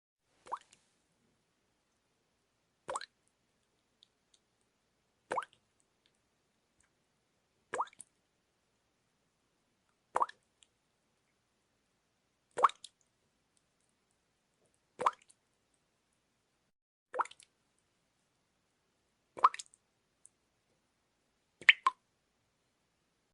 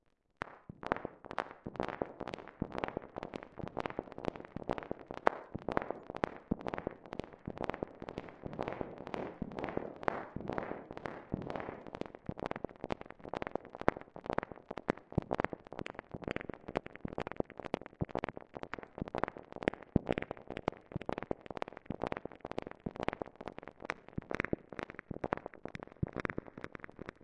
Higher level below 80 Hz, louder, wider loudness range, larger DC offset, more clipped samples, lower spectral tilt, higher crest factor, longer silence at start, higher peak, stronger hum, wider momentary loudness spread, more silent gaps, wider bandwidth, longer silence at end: second, -88 dBFS vs -58 dBFS; first, -33 LUFS vs -42 LUFS; first, 16 LU vs 3 LU; neither; neither; second, -0.5 dB/octave vs -7.5 dB/octave; about the same, 34 dB vs 36 dB; about the same, 0.5 s vs 0.45 s; about the same, -8 dBFS vs -6 dBFS; neither; first, 25 LU vs 9 LU; first, 16.82-17.06 s vs none; about the same, 11 kHz vs 10 kHz; first, 1.4 s vs 0 s